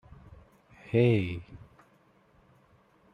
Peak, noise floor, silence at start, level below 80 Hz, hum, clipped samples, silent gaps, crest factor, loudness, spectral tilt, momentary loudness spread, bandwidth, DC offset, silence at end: -12 dBFS; -64 dBFS; 0.9 s; -60 dBFS; none; under 0.1%; none; 22 dB; -28 LUFS; -9 dB/octave; 27 LU; 5.6 kHz; under 0.1%; 1.55 s